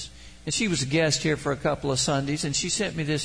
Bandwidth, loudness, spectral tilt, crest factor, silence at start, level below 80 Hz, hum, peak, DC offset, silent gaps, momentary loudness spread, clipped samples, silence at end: 10.5 kHz; -25 LUFS; -3.5 dB/octave; 16 dB; 0 s; -48 dBFS; none; -10 dBFS; 0.2%; none; 4 LU; under 0.1%; 0 s